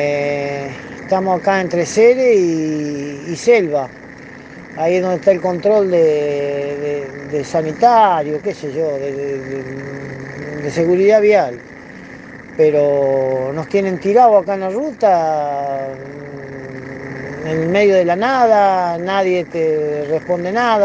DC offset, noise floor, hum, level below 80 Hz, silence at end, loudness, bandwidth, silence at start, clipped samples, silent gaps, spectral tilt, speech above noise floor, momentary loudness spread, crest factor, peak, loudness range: under 0.1%; -35 dBFS; none; -56 dBFS; 0 s; -15 LUFS; 9 kHz; 0 s; under 0.1%; none; -6 dB/octave; 20 dB; 18 LU; 16 dB; 0 dBFS; 3 LU